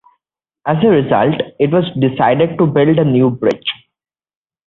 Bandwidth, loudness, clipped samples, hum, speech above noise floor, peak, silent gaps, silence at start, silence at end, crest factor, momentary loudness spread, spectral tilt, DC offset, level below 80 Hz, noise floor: 6.6 kHz; -14 LUFS; under 0.1%; none; 68 dB; -2 dBFS; none; 0.65 s; 0.95 s; 14 dB; 9 LU; -9 dB/octave; under 0.1%; -52 dBFS; -80 dBFS